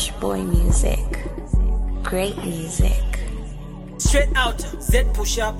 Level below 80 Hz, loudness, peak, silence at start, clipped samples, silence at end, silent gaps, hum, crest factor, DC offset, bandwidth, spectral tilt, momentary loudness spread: -22 dBFS; -22 LUFS; -4 dBFS; 0 s; under 0.1%; 0 s; none; none; 16 dB; under 0.1%; 15.5 kHz; -4.5 dB/octave; 11 LU